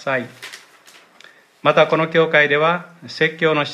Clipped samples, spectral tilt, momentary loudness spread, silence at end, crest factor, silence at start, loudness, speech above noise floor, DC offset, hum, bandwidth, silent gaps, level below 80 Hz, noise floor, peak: under 0.1%; -5.5 dB/octave; 19 LU; 0 s; 18 dB; 0 s; -17 LUFS; 31 dB; under 0.1%; none; 13 kHz; none; -72 dBFS; -48 dBFS; 0 dBFS